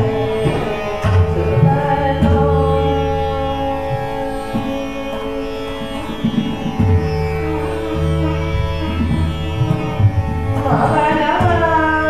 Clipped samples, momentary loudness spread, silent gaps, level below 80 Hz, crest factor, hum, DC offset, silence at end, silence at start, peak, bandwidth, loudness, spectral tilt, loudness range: under 0.1%; 9 LU; none; -28 dBFS; 14 dB; none; 2%; 0 s; 0 s; -2 dBFS; 13.5 kHz; -17 LUFS; -7.5 dB/octave; 5 LU